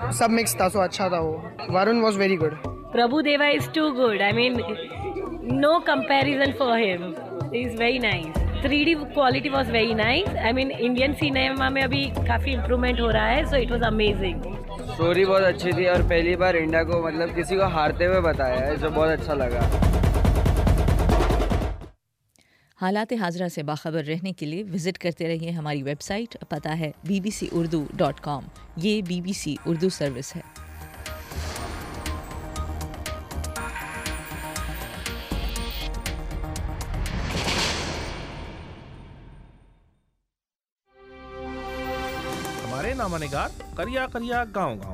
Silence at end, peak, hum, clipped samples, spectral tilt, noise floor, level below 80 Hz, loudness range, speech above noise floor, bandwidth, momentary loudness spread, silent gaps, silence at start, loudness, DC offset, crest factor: 0 s; -10 dBFS; none; under 0.1%; -5 dB/octave; -86 dBFS; -34 dBFS; 10 LU; 63 dB; 16 kHz; 13 LU; 40.72-40.76 s; 0 s; -24 LUFS; under 0.1%; 14 dB